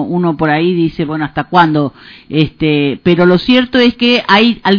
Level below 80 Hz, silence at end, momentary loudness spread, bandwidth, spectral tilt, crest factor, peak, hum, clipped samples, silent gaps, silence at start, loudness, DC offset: -42 dBFS; 0 s; 8 LU; 5.4 kHz; -7.5 dB/octave; 12 dB; 0 dBFS; none; 0.8%; none; 0 s; -11 LUFS; under 0.1%